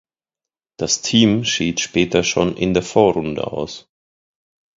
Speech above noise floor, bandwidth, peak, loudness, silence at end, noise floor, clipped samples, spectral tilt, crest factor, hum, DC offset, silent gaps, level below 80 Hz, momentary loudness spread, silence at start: 70 dB; 7.8 kHz; 0 dBFS; -18 LUFS; 0.95 s; -88 dBFS; under 0.1%; -4 dB/octave; 20 dB; none; under 0.1%; none; -46 dBFS; 12 LU; 0.8 s